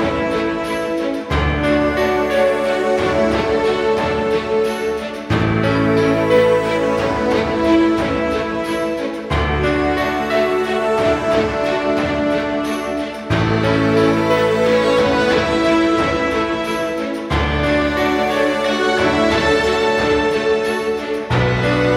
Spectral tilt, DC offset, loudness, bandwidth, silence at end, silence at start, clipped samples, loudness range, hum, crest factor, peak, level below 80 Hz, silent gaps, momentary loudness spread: -6 dB/octave; under 0.1%; -17 LUFS; 16.5 kHz; 0 s; 0 s; under 0.1%; 2 LU; none; 14 dB; -2 dBFS; -34 dBFS; none; 6 LU